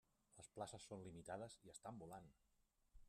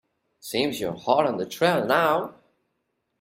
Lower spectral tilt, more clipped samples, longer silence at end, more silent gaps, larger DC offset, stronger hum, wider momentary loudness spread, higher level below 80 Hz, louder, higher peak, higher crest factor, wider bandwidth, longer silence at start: about the same, -4.5 dB/octave vs -4.5 dB/octave; neither; second, 0 s vs 0.9 s; neither; neither; neither; about the same, 8 LU vs 9 LU; second, -78 dBFS vs -66 dBFS; second, -57 LUFS vs -24 LUFS; second, -38 dBFS vs -6 dBFS; about the same, 20 dB vs 20 dB; second, 13.5 kHz vs 16 kHz; second, 0.3 s vs 0.45 s